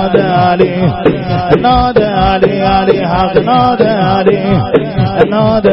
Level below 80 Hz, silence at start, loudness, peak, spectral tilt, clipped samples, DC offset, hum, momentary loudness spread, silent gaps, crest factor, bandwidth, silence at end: -28 dBFS; 0 s; -10 LUFS; 0 dBFS; -9.5 dB/octave; 0.2%; 0.5%; none; 3 LU; none; 10 dB; 5.8 kHz; 0 s